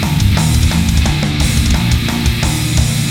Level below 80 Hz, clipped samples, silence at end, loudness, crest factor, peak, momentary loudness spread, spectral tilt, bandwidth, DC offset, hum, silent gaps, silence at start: -18 dBFS; under 0.1%; 0 s; -14 LUFS; 12 dB; 0 dBFS; 2 LU; -4.5 dB/octave; 18 kHz; 0.2%; none; none; 0 s